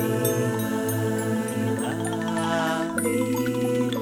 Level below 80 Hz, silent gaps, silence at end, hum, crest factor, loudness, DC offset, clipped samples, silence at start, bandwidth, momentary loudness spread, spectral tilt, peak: -60 dBFS; none; 0 s; none; 16 dB; -25 LUFS; under 0.1%; under 0.1%; 0 s; 18 kHz; 3 LU; -5.5 dB/octave; -8 dBFS